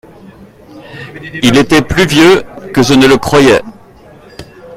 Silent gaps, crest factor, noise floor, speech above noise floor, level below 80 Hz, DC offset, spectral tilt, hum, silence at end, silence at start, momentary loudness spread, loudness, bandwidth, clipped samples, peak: none; 10 dB; -37 dBFS; 30 dB; -34 dBFS; under 0.1%; -5 dB/octave; none; 0 s; 0.75 s; 20 LU; -8 LUFS; 16 kHz; 0.8%; 0 dBFS